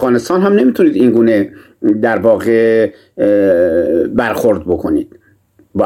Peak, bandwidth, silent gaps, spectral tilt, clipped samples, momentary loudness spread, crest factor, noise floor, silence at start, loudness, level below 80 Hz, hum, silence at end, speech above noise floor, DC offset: 0 dBFS; 16.5 kHz; none; -7 dB/octave; under 0.1%; 8 LU; 12 dB; -51 dBFS; 0 s; -12 LUFS; -44 dBFS; none; 0 s; 39 dB; under 0.1%